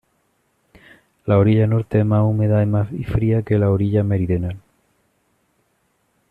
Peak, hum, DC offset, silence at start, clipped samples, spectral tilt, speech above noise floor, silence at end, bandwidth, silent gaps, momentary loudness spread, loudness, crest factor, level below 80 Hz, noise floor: -4 dBFS; none; under 0.1%; 1.25 s; under 0.1%; -10.5 dB/octave; 49 dB; 1.75 s; 4 kHz; none; 8 LU; -18 LUFS; 16 dB; -44 dBFS; -66 dBFS